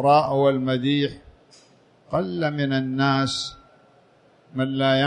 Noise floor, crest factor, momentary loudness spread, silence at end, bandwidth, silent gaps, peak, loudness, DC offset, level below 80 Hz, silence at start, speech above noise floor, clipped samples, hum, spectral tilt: -57 dBFS; 18 dB; 9 LU; 0 s; 10 kHz; none; -6 dBFS; -23 LUFS; under 0.1%; -58 dBFS; 0 s; 35 dB; under 0.1%; none; -6 dB/octave